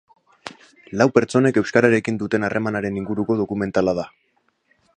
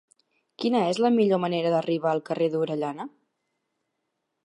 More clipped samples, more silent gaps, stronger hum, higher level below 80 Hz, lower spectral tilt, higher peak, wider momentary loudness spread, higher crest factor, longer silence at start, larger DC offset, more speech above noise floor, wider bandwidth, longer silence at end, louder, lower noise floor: neither; neither; neither; first, -54 dBFS vs -80 dBFS; about the same, -6.5 dB/octave vs -6.5 dB/octave; first, 0 dBFS vs -10 dBFS; first, 20 LU vs 9 LU; about the same, 20 dB vs 16 dB; second, 0.45 s vs 0.6 s; neither; second, 45 dB vs 55 dB; about the same, 10 kHz vs 11 kHz; second, 0.9 s vs 1.35 s; first, -20 LUFS vs -25 LUFS; second, -64 dBFS vs -80 dBFS